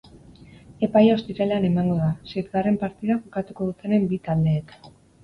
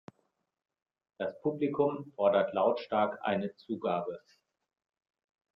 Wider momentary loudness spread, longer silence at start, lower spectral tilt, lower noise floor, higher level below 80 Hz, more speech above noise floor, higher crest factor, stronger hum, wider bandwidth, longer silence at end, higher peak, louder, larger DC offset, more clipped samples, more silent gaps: about the same, 10 LU vs 11 LU; second, 0.7 s vs 1.2 s; about the same, -9.5 dB/octave vs -8.5 dB/octave; second, -47 dBFS vs -78 dBFS; first, -52 dBFS vs -76 dBFS; second, 25 dB vs 47 dB; about the same, 18 dB vs 20 dB; neither; about the same, 5.8 kHz vs 5.8 kHz; second, 0.35 s vs 1.35 s; first, -6 dBFS vs -14 dBFS; first, -23 LUFS vs -32 LUFS; neither; neither; neither